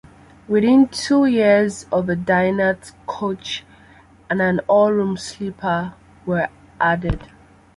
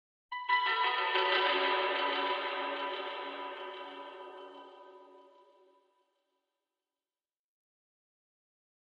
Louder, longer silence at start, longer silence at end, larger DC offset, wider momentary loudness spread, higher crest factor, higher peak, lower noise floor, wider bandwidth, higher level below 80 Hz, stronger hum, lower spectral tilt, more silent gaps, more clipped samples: first, -19 LUFS vs -32 LUFS; first, 0.5 s vs 0.3 s; second, 0.5 s vs 3.75 s; neither; second, 14 LU vs 20 LU; second, 16 dB vs 22 dB; first, -2 dBFS vs -16 dBFS; second, -48 dBFS vs under -90 dBFS; first, 11.5 kHz vs 7.4 kHz; first, -42 dBFS vs under -90 dBFS; neither; first, -6 dB/octave vs -2 dB/octave; neither; neither